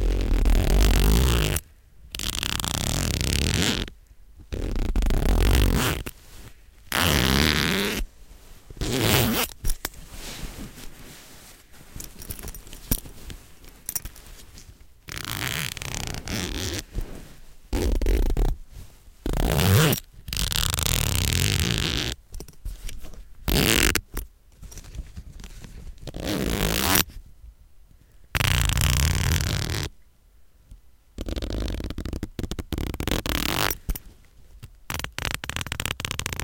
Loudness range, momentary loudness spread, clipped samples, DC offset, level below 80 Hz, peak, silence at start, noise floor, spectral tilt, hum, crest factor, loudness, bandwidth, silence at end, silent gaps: 11 LU; 21 LU; under 0.1%; under 0.1%; -30 dBFS; 0 dBFS; 0 s; -54 dBFS; -3.5 dB/octave; none; 26 dB; -25 LUFS; 17.5 kHz; 0 s; none